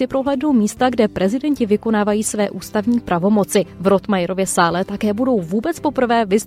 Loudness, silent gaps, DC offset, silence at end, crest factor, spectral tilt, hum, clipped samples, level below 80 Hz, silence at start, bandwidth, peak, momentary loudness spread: -18 LUFS; none; under 0.1%; 0 s; 16 dB; -5 dB/octave; none; under 0.1%; -48 dBFS; 0 s; 16 kHz; -2 dBFS; 4 LU